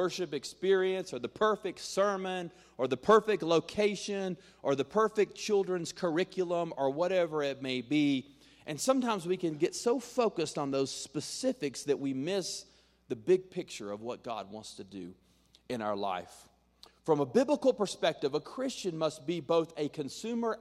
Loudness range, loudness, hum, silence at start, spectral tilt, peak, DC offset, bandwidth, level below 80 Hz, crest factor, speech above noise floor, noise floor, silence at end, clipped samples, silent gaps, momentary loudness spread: 6 LU; -32 LUFS; none; 0 s; -4.5 dB/octave; -12 dBFS; under 0.1%; 14 kHz; -72 dBFS; 20 dB; 29 dB; -61 dBFS; 0 s; under 0.1%; none; 12 LU